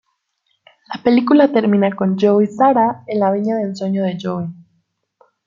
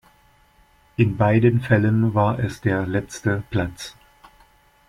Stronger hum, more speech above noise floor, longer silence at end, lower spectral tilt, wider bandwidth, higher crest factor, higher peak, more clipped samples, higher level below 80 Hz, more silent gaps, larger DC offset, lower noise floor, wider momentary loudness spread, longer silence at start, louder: neither; first, 53 dB vs 37 dB; about the same, 0.95 s vs 0.95 s; about the same, -8 dB/octave vs -7.5 dB/octave; second, 7.4 kHz vs 12 kHz; about the same, 16 dB vs 18 dB; about the same, -2 dBFS vs -4 dBFS; neither; second, -62 dBFS vs -48 dBFS; neither; neither; first, -68 dBFS vs -56 dBFS; about the same, 11 LU vs 12 LU; about the same, 0.9 s vs 1 s; first, -16 LUFS vs -21 LUFS